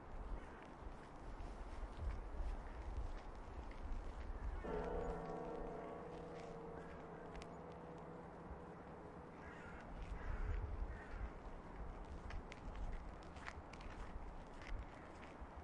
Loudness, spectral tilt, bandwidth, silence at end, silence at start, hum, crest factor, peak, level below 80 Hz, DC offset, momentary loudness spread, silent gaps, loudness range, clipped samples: -52 LUFS; -7 dB/octave; 10.5 kHz; 0 s; 0 s; none; 20 dB; -30 dBFS; -52 dBFS; under 0.1%; 8 LU; none; 5 LU; under 0.1%